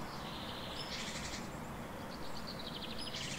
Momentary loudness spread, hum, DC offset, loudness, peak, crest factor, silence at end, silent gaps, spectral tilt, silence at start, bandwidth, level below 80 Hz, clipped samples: 5 LU; none; under 0.1%; -43 LUFS; -30 dBFS; 14 dB; 0 s; none; -3.5 dB/octave; 0 s; 16 kHz; -56 dBFS; under 0.1%